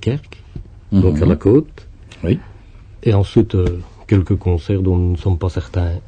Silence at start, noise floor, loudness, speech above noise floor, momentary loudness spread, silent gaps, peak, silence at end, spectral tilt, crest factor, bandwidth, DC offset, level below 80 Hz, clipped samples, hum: 0 s; -39 dBFS; -17 LUFS; 24 dB; 15 LU; none; -2 dBFS; 0 s; -9 dB/octave; 16 dB; 8 kHz; under 0.1%; -30 dBFS; under 0.1%; none